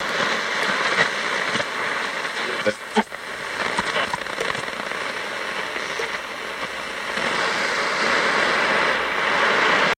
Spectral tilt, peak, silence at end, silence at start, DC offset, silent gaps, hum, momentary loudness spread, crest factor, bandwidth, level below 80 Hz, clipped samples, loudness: -2 dB/octave; -4 dBFS; 0.05 s; 0 s; under 0.1%; none; none; 9 LU; 18 dB; 16.5 kHz; -58 dBFS; under 0.1%; -22 LUFS